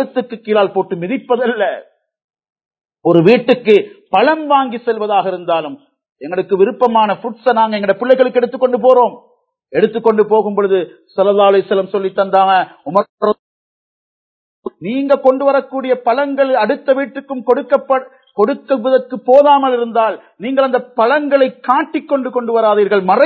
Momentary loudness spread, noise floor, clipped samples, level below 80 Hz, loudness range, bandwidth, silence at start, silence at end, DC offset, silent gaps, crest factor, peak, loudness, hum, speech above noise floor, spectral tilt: 9 LU; under -90 dBFS; 0.1%; -66 dBFS; 4 LU; 4.9 kHz; 0 s; 0 s; under 0.1%; 2.24-2.29 s, 2.66-2.71 s, 6.12-6.16 s, 13.09-13.18 s, 13.39-14.63 s; 14 dB; 0 dBFS; -14 LUFS; none; over 77 dB; -8 dB/octave